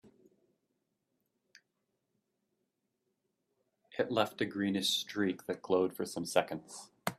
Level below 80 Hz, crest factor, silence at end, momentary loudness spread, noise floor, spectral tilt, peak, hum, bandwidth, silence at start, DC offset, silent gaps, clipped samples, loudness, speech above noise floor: -78 dBFS; 26 dB; 0.05 s; 10 LU; -84 dBFS; -4 dB/octave; -12 dBFS; none; 15.5 kHz; 3.9 s; under 0.1%; none; under 0.1%; -34 LUFS; 50 dB